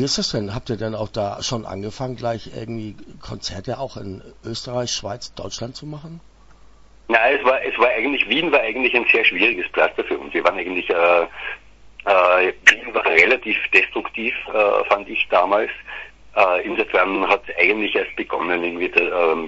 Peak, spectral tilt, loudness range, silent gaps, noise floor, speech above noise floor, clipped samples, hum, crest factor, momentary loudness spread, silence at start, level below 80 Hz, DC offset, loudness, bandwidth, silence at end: 0 dBFS; -3.5 dB/octave; 12 LU; none; -46 dBFS; 27 dB; under 0.1%; none; 20 dB; 17 LU; 0 s; -50 dBFS; under 0.1%; -18 LUFS; 11 kHz; 0 s